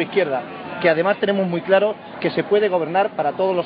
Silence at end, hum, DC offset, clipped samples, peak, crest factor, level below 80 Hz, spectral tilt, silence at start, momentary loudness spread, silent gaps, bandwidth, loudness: 0 s; none; under 0.1%; under 0.1%; -2 dBFS; 16 dB; -70 dBFS; -4 dB/octave; 0 s; 6 LU; none; 5.2 kHz; -20 LUFS